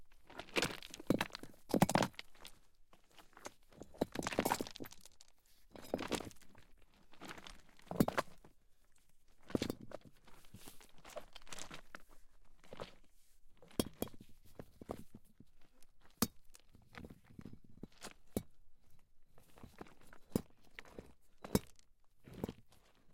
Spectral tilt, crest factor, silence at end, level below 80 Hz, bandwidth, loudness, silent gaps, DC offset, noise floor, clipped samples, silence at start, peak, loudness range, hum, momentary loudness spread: -4.5 dB/octave; 28 dB; 0 s; -62 dBFS; 16.5 kHz; -42 LUFS; none; under 0.1%; -64 dBFS; under 0.1%; 0 s; -18 dBFS; 13 LU; none; 23 LU